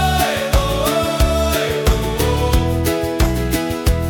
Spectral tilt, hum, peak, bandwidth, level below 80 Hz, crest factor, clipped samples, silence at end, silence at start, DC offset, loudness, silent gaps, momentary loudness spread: -5 dB/octave; none; -2 dBFS; 19 kHz; -22 dBFS; 14 dB; under 0.1%; 0 s; 0 s; under 0.1%; -17 LUFS; none; 3 LU